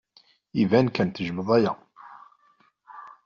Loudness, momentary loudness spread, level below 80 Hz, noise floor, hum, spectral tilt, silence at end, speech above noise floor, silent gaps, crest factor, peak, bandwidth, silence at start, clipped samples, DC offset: -24 LUFS; 19 LU; -64 dBFS; -63 dBFS; none; -6 dB/octave; 0.15 s; 41 dB; none; 20 dB; -6 dBFS; 7 kHz; 0.55 s; under 0.1%; under 0.1%